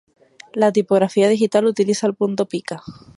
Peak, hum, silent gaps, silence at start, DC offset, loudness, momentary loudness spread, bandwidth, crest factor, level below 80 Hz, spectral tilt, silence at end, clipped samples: -2 dBFS; none; none; 0.55 s; under 0.1%; -18 LUFS; 13 LU; 11.5 kHz; 16 dB; -62 dBFS; -5.5 dB/octave; 0.25 s; under 0.1%